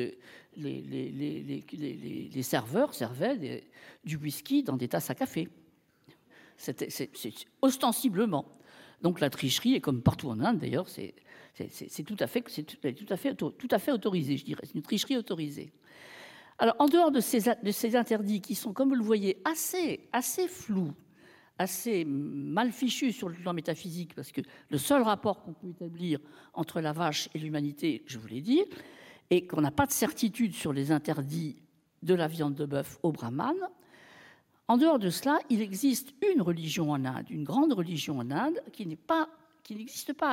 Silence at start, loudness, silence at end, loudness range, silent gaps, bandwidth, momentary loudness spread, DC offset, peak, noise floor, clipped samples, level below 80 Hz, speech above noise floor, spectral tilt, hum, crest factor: 0 s; -31 LUFS; 0 s; 6 LU; none; 17 kHz; 14 LU; under 0.1%; -10 dBFS; -63 dBFS; under 0.1%; -66 dBFS; 32 dB; -5 dB/octave; none; 20 dB